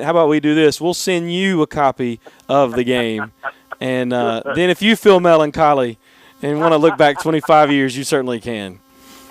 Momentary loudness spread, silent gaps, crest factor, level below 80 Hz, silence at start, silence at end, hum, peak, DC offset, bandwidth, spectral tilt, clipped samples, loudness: 14 LU; none; 14 dB; -52 dBFS; 0 s; 0.55 s; none; 0 dBFS; under 0.1%; 15.5 kHz; -5 dB/octave; under 0.1%; -15 LUFS